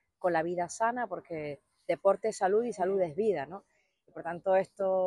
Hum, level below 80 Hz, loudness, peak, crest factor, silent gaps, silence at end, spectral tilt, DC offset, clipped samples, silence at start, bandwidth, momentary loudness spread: none; -74 dBFS; -31 LUFS; -12 dBFS; 18 dB; none; 0 s; -5.5 dB/octave; under 0.1%; under 0.1%; 0.2 s; 11.5 kHz; 14 LU